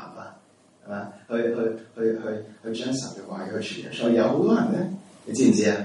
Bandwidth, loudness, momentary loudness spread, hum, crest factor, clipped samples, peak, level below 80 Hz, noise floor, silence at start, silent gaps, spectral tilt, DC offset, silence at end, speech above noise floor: 11.5 kHz; -25 LUFS; 15 LU; none; 18 dB; under 0.1%; -6 dBFS; -72 dBFS; -56 dBFS; 0 s; none; -5.5 dB/octave; under 0.1%; 0 s; 32 dB